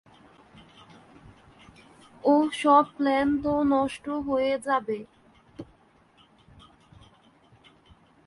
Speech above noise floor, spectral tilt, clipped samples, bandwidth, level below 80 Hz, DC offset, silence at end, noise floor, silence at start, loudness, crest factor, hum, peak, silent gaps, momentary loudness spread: 36 dB; -5.5 dB/octave; under 0.1%; 11.5 kHz; -58 dBFS; under 0.1%; 2.65 s; -60 dBFS; 2.25 s; -25 LUFS; 20 dB; none; -8 dBFS; none; 15 LU